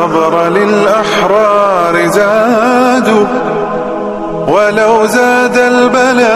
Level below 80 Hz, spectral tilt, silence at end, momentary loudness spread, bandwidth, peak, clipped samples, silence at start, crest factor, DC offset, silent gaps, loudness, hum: -44 dBFS; -4.5 dB/octave; 0 s; 7 LU; 15 kHz; 0 dBFS; under 0.1%; 0 s; 8 dB; 0.2%; none; -9 LUFS; none